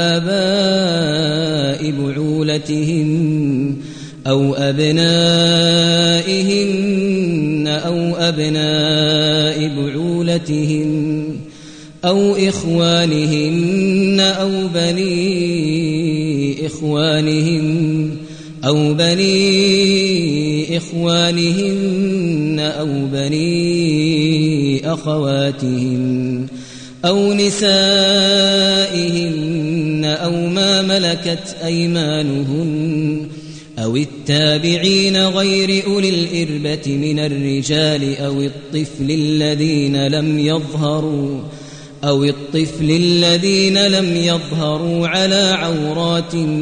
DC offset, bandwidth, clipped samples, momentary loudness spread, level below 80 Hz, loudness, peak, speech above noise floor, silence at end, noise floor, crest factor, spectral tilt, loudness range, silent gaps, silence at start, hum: under 0.1%; 10 kHz; under 0.1%; 8 LU; -50 dBFS; -15 LUFS; -2 dBFS; 21 dB; 0 s; -36 dBFS; 14 dB; -5 dB/octave; 4 LU; none; 0 s; none